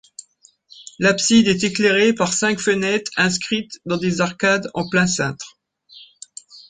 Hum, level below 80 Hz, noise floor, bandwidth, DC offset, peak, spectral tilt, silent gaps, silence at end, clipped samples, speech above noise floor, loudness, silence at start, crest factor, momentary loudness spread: none; -56 dBFS; -55 dBFS; 9.6 kHz; under 0.1%; -2 dBFS; -3.5 dB/octave; none; 0.1 s; under 0.1%; 37 dB; -18 LUFS; 0.8 s; 18 dB; 22 LU